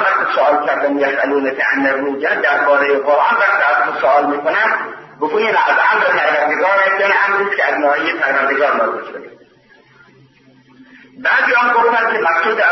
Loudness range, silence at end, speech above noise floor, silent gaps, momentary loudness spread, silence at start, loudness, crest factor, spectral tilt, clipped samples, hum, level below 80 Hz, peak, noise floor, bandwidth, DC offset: 5 LU; 0 s; 34 dB; none; 5 LU; 0 s; -14 LUFS; 14 dB; -4.5 dB/octave; under 0.1%; none; -68 dBFS; -2 dBFS; -48 dBFS; 6.2 kHz; under 0.1%